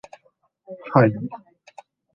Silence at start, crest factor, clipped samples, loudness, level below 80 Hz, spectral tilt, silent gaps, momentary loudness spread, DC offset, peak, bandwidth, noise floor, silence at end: 0.7 s; 22 dB; under 0.1%; -20 LUFS; -64 dBFS; -9.5 dB/octave; none; 24 LU; under 0.1%; -2 dBFS; 7.2 kHz; -64 dBFS; 0.8 s